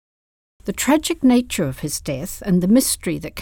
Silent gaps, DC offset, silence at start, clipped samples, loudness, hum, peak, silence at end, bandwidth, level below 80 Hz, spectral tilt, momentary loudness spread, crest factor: none; under 0.1%; 0.65 s; under 0.1%; -19 LUFS; none; -4 dBFS; 0 s; 19 kHz; -44 dBFS; -4.5 dB/octave; 11 LU; 16 dB